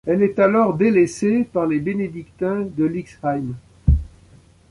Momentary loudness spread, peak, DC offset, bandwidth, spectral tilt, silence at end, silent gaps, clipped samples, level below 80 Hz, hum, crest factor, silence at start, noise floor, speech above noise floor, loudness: 10 LU; -4 dBFS; under 0.1%; 11.5 kHz; -8 dB/octave; 0.65 s; none; under 0.1%; -30 dBFS; none; 16 dB; 0.05 s; -50 dBFS; 31 dB; -20 LUFS